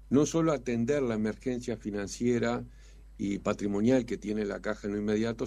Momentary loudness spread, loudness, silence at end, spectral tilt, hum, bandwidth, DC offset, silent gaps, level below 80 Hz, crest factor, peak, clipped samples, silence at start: 8 LU; -31 LUFS; 0 s; -6 dB/octave; none; 12 kHz; under 0.1%; none; -52 dBFS; 18 dB; -12 dBFS; under 0.1%; 0 s